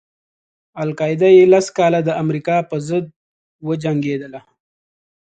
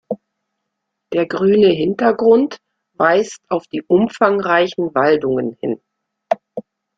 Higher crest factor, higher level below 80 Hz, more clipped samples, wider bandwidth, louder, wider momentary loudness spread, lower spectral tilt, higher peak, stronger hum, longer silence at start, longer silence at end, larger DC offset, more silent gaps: about the same, 16 dB vs 16 dB; about the same, -60 dBFS vs -58 dBFS; neither; first, 9 kHz vs 7.8 kHz; about the same, -16 LUFS vs -16 LUFS; first, 16 LU vs 12 LU; about the same, -6.5 dB/octave vs -6 dB/octave; about the same, 0 dBFS vs -2 dBFS; neither; first, 0.75 s vs 0.1 s; first, 0.85 s vs 0.35 s; neither; first, 3.16-3.59 s vs none